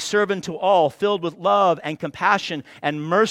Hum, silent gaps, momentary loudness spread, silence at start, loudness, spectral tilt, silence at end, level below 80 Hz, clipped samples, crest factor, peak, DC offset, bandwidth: none; none; 8 LU; 0 s; -21 LUFS; -4.5 dB/octave; 0 s; -66 dBFS; under 0.1%; 18 dB; -4 dBFS; under 0.1%; 14.5 kHz